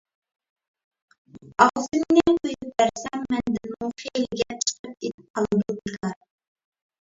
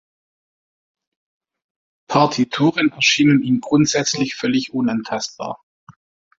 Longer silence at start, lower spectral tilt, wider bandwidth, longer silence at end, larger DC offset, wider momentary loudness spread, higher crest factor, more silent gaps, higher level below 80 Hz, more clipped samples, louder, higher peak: second, 1.35 s vs 2.1 s; about the same, -4 dB/octave vs -4 dB/octave; about the same, 7.8 kHz vs 7.8 kHz; first, 0.85 s vs 0.45 s; neither; first, 14 LU vs 11 LU; about the same, 24 dB vs 20 dB; second, 4.79-4.84 s, 5.14-5.18 s, 5.30-5.34 s vs 5.63-5.87 s; about the same, -56 dBFS vs -60 dBFS; neither; second, -24 LUFS vs -18 LUFS; about the same, -2 dBFS vs -2 dBFS